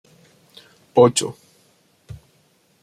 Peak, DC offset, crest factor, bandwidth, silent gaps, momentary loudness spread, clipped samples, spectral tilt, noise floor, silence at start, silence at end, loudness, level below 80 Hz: -2 dBFS; under 0.1%; 22 dB; 15 kHz; none; 28 LU; under 0.1%; -4.5 dB/octave; -60 dBFS; 0.95 s; 0.65 s; -18 LUFS; -58 dBFS